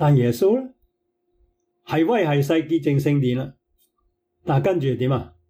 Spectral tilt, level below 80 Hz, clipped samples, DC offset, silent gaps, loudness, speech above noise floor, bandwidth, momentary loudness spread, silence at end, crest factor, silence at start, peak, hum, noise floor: -8 dB/octave; -58 dBFS; under 0.1%; under 0.1%; none; -21 LUFS; 52 dB; 16 kHz; 8 LU; 0.2 s; 14 dB; 0 s; -8 dBFS; none; -72 dBFS